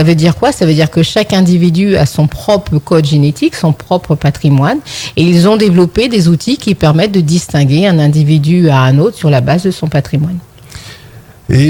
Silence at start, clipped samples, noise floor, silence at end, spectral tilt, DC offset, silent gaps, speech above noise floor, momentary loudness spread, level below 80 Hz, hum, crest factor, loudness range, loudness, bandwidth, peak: 0 s; under 0.1%; -35 dBFS; 0 s; -6.5 dB/octave; under 0.1%; none; 26 dB; 7 LU; -36 dBFS; none; 10 dB; 2 LU; -10 LUFS; 18.5 kHz; 0 dBFS